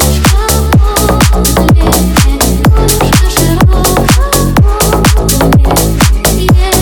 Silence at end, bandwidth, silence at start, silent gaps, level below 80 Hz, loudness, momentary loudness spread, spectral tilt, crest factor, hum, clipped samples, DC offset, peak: 0 s; over 20 kHz; 0 s; none; -10 dBFS; -8 LUFS; 2 LU; -4.5 dB/octave; 6 dB; none; 0.9%; under 0.1%; 0 dBFS